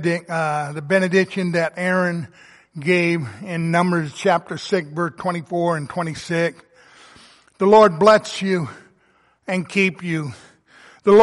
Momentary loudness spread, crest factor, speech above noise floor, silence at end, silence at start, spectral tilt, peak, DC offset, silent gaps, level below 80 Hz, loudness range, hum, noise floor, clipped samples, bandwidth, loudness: 12 LU; 18 dB; 40 dB; 0 s; 0 s; -6 dB/octave; -2 dBFS; under 0.1%; none; -62 dBFS; 5 LU; none; -59 dBFS; under 0.1%; 11.5 kHz; -20 LUFS